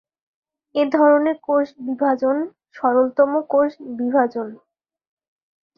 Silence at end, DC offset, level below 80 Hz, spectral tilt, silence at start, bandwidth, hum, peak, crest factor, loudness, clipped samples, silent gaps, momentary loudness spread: 1.25 s; under 0.1%; -70 dBFS; -7 dB/octave; 0.75 s; 6 kHz; none; -2 dBFS; 18 dB; -19 LUFS; under 0.1%; none; 11 LU